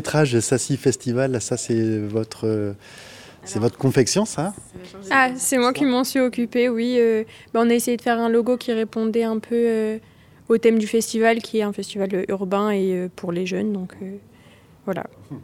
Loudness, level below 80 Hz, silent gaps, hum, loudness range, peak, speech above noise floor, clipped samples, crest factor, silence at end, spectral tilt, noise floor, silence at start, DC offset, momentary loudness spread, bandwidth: -21 LUFS; -60 dBFS; none; none; 4 LU; -4 dBFS; 29 dB; under 0.1%; 18 dB; 0 s; -5 dB/octave; -50 dBFS; 0 s; under 0.1%; 13 LU; 16.5 kHz